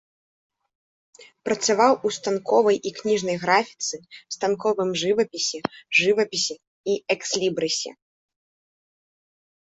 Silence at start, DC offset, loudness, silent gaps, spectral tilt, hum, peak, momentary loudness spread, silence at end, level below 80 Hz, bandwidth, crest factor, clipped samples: 1.45 s; under 0.1%; -23 LUFS; 6.67-6.84 s; -2.5 dB/octave; none; -2 dBFS; 10 LU; 1.85 s; -68 dBFS; 8.2 kHz; 22 dB; under 0.1%